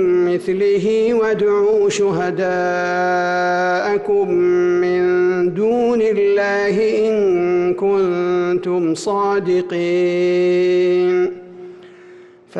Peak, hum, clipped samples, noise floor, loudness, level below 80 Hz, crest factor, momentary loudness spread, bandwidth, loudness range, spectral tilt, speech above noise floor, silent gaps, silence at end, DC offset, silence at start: -10 dBFS; none; under 0.1%; -42 dBFS; -16 LUFS; -56 dBFS; 6 dB; 4 LU; 9 kHz; 1 LU; -6 dB/octave; 26 dB; none; 0 s; under 0.1%; 0 s